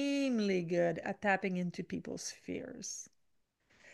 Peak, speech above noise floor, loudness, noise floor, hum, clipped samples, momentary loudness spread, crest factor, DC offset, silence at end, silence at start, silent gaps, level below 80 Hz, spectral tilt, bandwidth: -16 dBFS; 41 dB; -36 LUFS; -78 dBFS; none; under 0.1%; 11 LU; 20 dB; under 0.1%; 0 s; 0 s; none; -74 dBFS; -5 dB/octave; 12.5 kHz